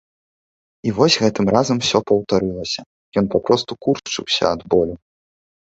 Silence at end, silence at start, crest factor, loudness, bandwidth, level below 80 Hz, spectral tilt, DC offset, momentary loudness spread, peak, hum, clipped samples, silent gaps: 0.7 s; 0.85 s; 18 dB; -19 LUFS; 8.2 kHz; -48 dBFS; -4.5 dB/octave; under 0.1%; 10 LU; -2 dBFS; none; under 0.1%; 2.86-3.12 s